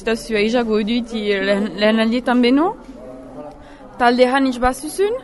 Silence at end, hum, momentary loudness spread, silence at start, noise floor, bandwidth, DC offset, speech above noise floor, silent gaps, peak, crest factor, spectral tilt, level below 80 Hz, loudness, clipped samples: 0 s; none; 21 LU; 0 s; -39 dBFS; 12 kHz; under 0.1%; 22 dB; none; 0 dBFS; 18 dB; -5 dB/octave; -40 dBFS; -17 LUFS; under 0.1%